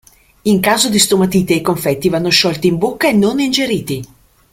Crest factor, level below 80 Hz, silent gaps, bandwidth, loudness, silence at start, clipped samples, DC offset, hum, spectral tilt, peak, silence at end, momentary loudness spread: 14 dB; -46 dBFS; none; 16.5 kHz; -13 LUFS; 0.45 s; under 0.1%; under 0.1%; none; -4 dB/octave; 0 dBFS; 0.5 s; 7 LU